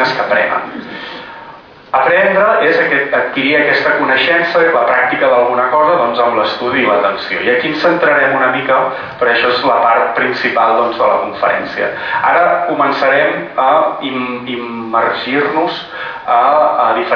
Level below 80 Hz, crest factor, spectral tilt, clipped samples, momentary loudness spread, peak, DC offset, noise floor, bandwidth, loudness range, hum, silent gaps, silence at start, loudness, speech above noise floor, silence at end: -54 dBFS; 12 dB; -6 dB/octave; under 0.1%; 9 LU; 0 dBFS; under 0.1%; -36 dBFS; 5.4 kHz; 3 LU; none; none; 0 s; -12 LUFS; 23 dB; 0 s